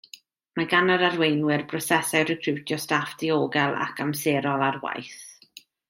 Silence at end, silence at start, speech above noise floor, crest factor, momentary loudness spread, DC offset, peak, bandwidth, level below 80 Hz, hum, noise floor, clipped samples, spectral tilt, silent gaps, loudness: 0.55 s; 0.55 s; 28 dB; 20 dB; 12 LU; under 0.1%; -6 dBFS; 16.5 kHz; -68 dBFS; none; -52 dBFS; under 0.1%; -4.5 dB/octave; none; -24 LUFS